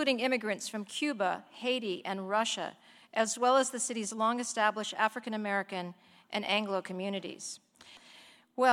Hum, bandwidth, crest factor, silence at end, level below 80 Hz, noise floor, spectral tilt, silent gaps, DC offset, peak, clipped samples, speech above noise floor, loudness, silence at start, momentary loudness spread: none; 15.5 kHz; 20 dB; 0 s; -84 dBFS; -58 dBFS; -2.5 dB/octave; none; under 0.1%; -12 dBFS; under 0.1%; 25 dB; -32 LUFS; 0 s; 13 LU